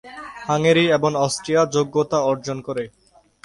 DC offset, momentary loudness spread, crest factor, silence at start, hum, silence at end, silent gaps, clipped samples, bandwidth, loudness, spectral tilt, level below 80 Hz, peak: under 0.1%; 14 LU; 16 dB; 0.05 s; none; 0.55 s; none; under 0.1%; 11.5 kHz; -20 LUFS; -5 dB/octave; -58 dBFS; -4 dBFS